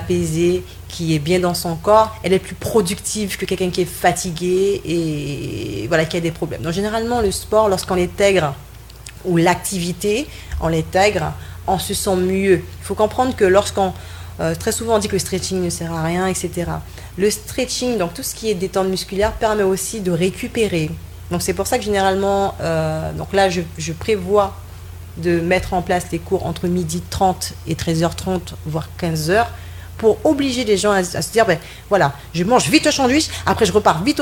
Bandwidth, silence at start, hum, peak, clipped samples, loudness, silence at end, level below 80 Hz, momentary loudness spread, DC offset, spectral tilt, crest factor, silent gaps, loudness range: 18 kHz; 0 s; none; 0 dBFS; under 0.1%; -19 LUFS; 0 s; -38 dBFS; 9 LU; under 0.1%; -4.5 dB/octave; 18 dB; none; 3 LU